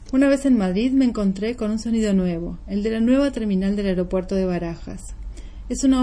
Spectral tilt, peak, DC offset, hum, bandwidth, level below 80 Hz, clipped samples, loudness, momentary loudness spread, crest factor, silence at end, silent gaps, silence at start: -6.5 dB/octave; -6 dBFS; under 0.1%; none; 10.5 kHz; -36 dBFS; under 0.1%; -21 LUFS; 16 LU; 14 dB; 0 s; none; 0 s